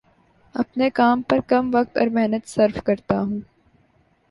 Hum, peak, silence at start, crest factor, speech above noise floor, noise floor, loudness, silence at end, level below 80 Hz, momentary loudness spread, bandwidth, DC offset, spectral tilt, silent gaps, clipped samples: none; -4 dBFS; 0.55 s; 18 dB; 41 dB; -61 dBFS; -21 LUFS; 0.85 s; -54 dBFS; 9 LU; 11.5 kHz; under 0.1%; -6.5 dB/octave; none; under 0.1%